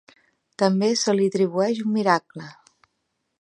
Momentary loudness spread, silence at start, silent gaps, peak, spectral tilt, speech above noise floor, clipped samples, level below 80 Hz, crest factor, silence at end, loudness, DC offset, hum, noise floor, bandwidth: 18 LU; 0.6 s; none; -4 dBFS; -5 dB/octave; 54 dB; under 0.1%; -76 dBFS; 20 dB; 0.9 s; -22 LUFS; under 0.1%; none; -76 dBFS; 11 kHz